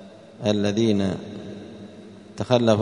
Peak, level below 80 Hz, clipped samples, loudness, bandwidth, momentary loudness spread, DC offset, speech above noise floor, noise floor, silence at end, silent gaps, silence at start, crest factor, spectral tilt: -2 dBFS; -60 dBFS; under 0.1%; -23 LUFS; 10.5 kHz; 21 LU; under 0.1%; 23 dB; -43 dBFS; 0 s; none; 0 s; 22 dB; -6.5 dB/octave